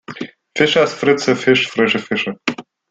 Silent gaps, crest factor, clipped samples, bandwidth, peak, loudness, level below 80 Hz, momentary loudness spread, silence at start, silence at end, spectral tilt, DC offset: none; 16 dB; under 0.1%; 9 kHz; -2 dBFS; -16 LUFS; -58 dBFS; 15 LU; 0.1 s; 0.3 s; -4.5 dB/octave; under 0.1%